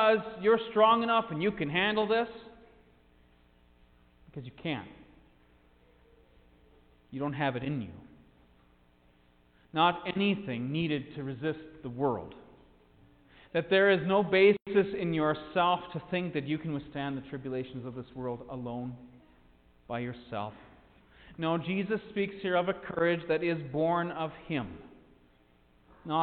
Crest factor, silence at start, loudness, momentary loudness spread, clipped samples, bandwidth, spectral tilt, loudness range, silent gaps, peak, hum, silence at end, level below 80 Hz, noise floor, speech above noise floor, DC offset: 22 dB; 0 s; -30 LUFS; 17 LU; under 0.1%; 4.6 kHz; -9.5 dB/octave; 14 LU; none; -10 dBFS; none; 0 s; -62 dBFS; -64 dBFS; 34 dB; under 0.1%